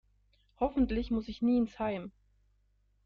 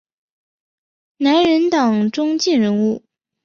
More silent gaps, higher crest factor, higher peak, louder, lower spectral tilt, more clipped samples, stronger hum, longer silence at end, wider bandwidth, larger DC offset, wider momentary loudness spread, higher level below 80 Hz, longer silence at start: neither; about the same, 16 dB vs 14 dB; second, -18 dBFS vs -4 dBFS; second, -32 LUFS vs -16 LUFS; first, -8 dB/octave vs -5 dB/octave; neither; first, 50 Hz at -50 dBFS vs none; first, 0.95 s vs 0.45 s; second, 6.6 kHz vs 7.4 kHz; neither; about the same, 8 LU vs 7 LU; first, -48 dBFS vs -62 dBFS; second, 0.6 s vs 1.2 s